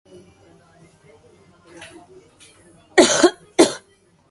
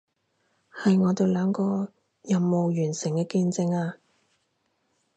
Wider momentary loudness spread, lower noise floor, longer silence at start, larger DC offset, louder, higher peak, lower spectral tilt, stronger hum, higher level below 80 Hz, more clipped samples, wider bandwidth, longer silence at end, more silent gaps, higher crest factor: first, 27 LU vs 8 LU; second, -57 dBFS vs -73 dBFS; first, 2.95 s vs 0.75 s; neither; first, -16 LUFS vs -25 LUFS; first, 0 dBFS vs -10 dBFS; second, -2 dB/octave vs -7 dB/octave; neither; first, -60 dBFS vs -70 dBFS; neither; first, 11.5 kHz vs 8.6 kHz; second, 0.55 s vs 1.2 s; neither; about the same, 22 dB vs 18 dB